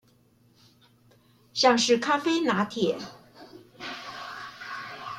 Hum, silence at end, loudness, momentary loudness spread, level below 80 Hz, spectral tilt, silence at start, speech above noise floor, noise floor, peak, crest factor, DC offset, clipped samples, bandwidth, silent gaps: none; 0 s; -26 LUFS; 17 LU; -72 dBFS; -3.5 dB/octave; 1.55 s; 38 dB; -62 dBFS; -8 dBFS; 22 dB; under 0.1%; under 0.1%; 15 kHz; none